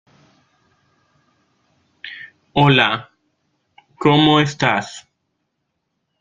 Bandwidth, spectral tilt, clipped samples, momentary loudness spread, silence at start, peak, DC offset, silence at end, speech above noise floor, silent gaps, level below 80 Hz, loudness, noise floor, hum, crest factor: 7.6 kHz; -5.5 dB/octave; under 0.1%; 23 LU; 2.05 s; -2 dBFS; under 0.1%; 1.2 s; 59 dB; none; -54 dBFS; -16 LUFS; -74 dBFS; none; 20 dB